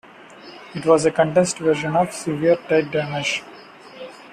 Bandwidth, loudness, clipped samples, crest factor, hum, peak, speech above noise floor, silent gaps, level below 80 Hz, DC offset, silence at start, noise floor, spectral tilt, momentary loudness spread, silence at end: 13.5 kHz; -20 LUFS; under 0.1%; 18 dB; none; -4 dBFS; 23 dB; none; -58 dBFS; under 0.1%; 0.2 s; -42 dBFS; -5 dB/octave; 21 LU; 0 s